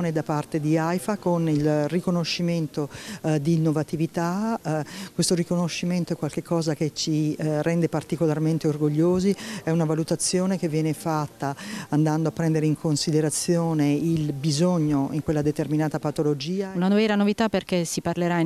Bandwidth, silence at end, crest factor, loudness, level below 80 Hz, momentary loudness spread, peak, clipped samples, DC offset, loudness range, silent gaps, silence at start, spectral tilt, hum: 14 kHz; 0 s; 12 dB; -24 LUFS; -56 dBFS; 5 LU; -10 dBFS; under 0.1%; under 0.1%; 2 LU; none; 0 s; -6 dB/octave; none